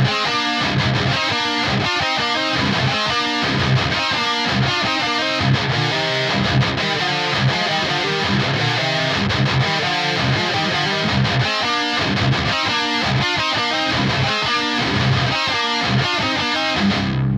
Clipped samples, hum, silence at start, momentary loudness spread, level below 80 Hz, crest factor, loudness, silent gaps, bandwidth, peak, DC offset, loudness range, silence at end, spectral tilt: under 0.1%; none; 0 s; 1 LU; -42 dBFS; 12 dB; -18 LUFS; none; 11.5 kHz; -6 dBFS; under 0.1%; 0 LU; 0 s; -4.5 dB/octave